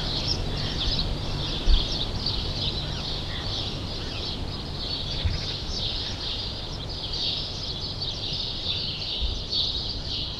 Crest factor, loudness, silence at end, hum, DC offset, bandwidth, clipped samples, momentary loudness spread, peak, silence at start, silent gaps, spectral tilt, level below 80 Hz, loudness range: 22 dB; -28 LUFS; 0 s; none; under 0.1%; 12 kHz; under 0.1%; 6 LU; -6 dBFS; 0 s; none; -4.5 dB/octave; -32 dBFS; 2 LU